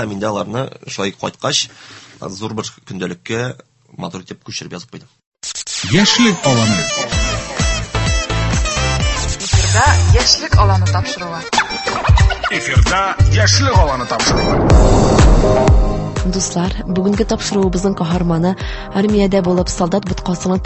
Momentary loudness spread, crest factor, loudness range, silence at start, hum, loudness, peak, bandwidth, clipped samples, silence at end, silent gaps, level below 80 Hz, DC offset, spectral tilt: 14 LU; 14 dB; 10 LU; 0 s; none; -15 LUFS; 0 dBFS; 8.6 kHz; under 0.1%; 0 s; 5.27-5.32 s; -20 dBFS; under 0.1%; -4.5 dB/octave